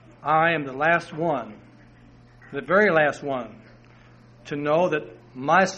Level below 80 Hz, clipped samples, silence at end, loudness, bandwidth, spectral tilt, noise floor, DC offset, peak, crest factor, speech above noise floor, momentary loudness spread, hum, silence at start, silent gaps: -60 dBFS; under 0.1%; 0 s; -23 LUFS; 9 kHz; -5.5 dB/octave; -51 dBFS; under 0.1%; -4 dBFS; 20 dB; 28 dB; 16 LU; none; 0.25 s; none